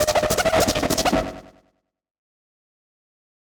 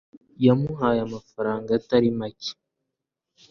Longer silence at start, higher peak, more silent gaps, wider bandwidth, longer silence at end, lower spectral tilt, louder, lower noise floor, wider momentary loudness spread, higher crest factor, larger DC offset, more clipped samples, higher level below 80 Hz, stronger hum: second, 0 s vs 0.4 s; about the same, -8 dBFS vs -6 dBFS; neither; first, over 20 kHz vs 6.8 kHz; first, 2.15 s vs 1 s; second, -3.5 dB/octave vs -7.5 dB/octave; first, -20 LUFS vs -24 LUFS; second, -68 dBFS vs -84 dBFS; second, 6 LU vs 13 LU; about the same, 18 dB vs 20 dB; neither; neither; first, -42 dBFS vs -58 dBFS; neither